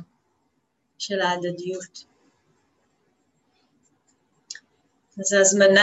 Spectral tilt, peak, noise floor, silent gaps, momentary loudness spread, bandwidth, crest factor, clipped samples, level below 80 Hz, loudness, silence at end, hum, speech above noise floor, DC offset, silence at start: -2.5 dB/octave; -4 dBFS; -72 dBFS; none; 25 LU; 8.8 kHz; 22 dB; under 0.1%; -76 dBFS; -21 LUFS; 0 s; none; 52 dB; under 0.1%; 0 s